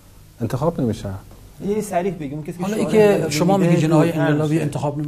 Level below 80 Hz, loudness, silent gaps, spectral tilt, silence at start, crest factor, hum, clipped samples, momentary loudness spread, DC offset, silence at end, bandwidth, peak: -46 dBFS; -19 LUFS; none; -6.5 dB/octave; 0.4 s; 16 dB; none; under 0.1%; 14 LU; under 0.1%; 0 s; 15 kHz; -2 dBFS